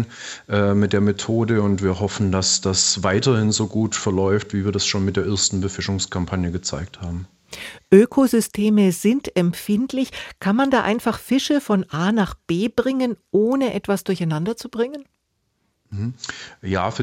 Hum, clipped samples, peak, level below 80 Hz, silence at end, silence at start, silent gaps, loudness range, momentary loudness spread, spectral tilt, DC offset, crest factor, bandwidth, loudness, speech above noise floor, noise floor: none; under 0.1%; -2 dBFS; -52 dBFS; 0 s; 0 s; none; 4 LU; 12 LU; -5 dB/octave; under 0.1%; 18 dB; 16.5 kHz; -20 LUFS; 51 dB; -71 dBFS